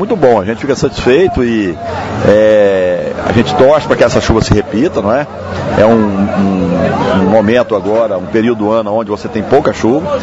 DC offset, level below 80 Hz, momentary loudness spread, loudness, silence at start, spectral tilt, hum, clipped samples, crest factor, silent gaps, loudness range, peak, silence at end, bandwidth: under 0.1%; -32 dBFS; 7 LU; -11 LUFS; 0 s; -6.5 dB/octave; none; 0.5%; 10 dB; none; 2 LU; 0 dBFS; 0 s; 8 kHz